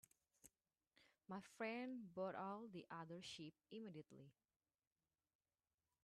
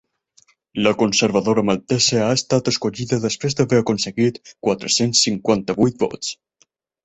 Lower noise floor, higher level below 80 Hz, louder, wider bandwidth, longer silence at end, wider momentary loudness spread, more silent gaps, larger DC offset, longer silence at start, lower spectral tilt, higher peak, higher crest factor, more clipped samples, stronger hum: first, under -90 dBFS vs -62 dBFS; second, under -90 dBFS vs -54 dBFS; second, -53 LUFS vs -19 LUFS; first, 12.5 kHz vs 8.4 kHz; first, 1.75 s vs 0.7 s; about the same, 9 LU vs 7 LU; neither; neither; second, 0.45 s vs 0.75 s; about the same, -5 dB/octave vs -4 dB/octave; second, -36 dBFS vs -2 dBFS; about the same, 20 dB vs 18 dB; neither; neither